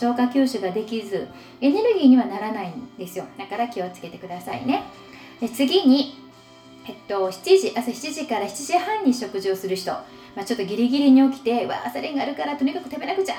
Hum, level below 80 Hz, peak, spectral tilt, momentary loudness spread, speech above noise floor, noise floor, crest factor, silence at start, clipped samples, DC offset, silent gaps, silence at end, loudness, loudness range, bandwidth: none; -66 dBFS; -4 dBFS; -4.5 dB/octave; 17 LU; 25 dB; -47 dBFS; 18 dB; 0 s; under 0.1%; under 0.1%; none; 0 s; -22 LUFS; 4 LU; 16.5 kHz